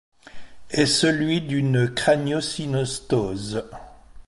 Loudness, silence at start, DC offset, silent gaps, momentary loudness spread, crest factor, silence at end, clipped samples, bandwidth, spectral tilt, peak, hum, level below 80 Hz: -22 LUFS; 0.25 s; under 0.1%; none; 11 LU; 20 dB; 0.05 s; under 0.1%; 11.5 kHz; -5 dB/octave; -4 dBFS; none; -50 dBFS